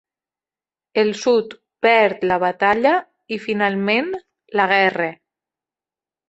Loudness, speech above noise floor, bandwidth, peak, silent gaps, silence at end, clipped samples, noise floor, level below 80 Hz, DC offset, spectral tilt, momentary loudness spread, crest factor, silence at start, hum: -18 LUFS; over 72 dB; 8.2 kHz; -2 dBFS; none; 1.15 s; under 0.1%; under -90 dBFS; -62 dBFS; under 0.1%; -5 dB/octave; 12 LU; 18 dB; 0.95 s; none